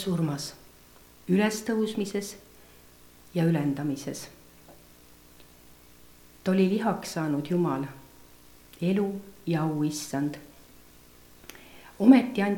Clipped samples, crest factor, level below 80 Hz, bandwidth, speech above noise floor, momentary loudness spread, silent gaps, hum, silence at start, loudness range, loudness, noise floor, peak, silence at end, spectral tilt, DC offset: under 0.1%; 22 dB; -62 dBFS; 19 kHz; 28 dB; 21 LU; none; 60 Hz at -55 dBFS; 0 s; 4 LU; -27 LUFS; -54 dBFS; -6 dBFS; 0 s; -6.5 dB/octave; under 0.1%